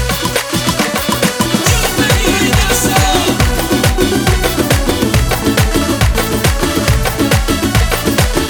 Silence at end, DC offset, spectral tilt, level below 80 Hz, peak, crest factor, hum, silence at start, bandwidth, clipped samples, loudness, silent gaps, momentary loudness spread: 0 s; under 0.1%; -4 dB/octave; -20 dBFS; 0 dBFS; 12 dB; none; 0 s; 19.5 kHz; under 0.1%; -12 LUFS; none; 3 LU